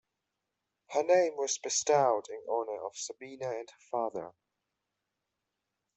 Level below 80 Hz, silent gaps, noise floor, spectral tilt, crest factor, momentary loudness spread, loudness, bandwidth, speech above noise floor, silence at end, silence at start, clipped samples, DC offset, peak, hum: -82 dBFS; none; -86 dBFS; -2.5 dB/octave; 20 dB; 14 LU; -32 LUFS; 8.2 kHz; 55 dB; 1.65 s; 0.9 s; under 0.1%; under 0.1%; -14 dBFS; none